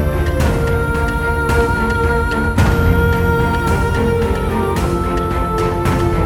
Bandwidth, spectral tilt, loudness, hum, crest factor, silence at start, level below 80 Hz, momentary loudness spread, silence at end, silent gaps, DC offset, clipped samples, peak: 17.5 kHz; -7 dB/octave; -16 LUFS; none; 14 dB; 0 s; -22 dBFS; 3 LU; 0 s; none; under 0.1%; under 0.1%; -2 dBFS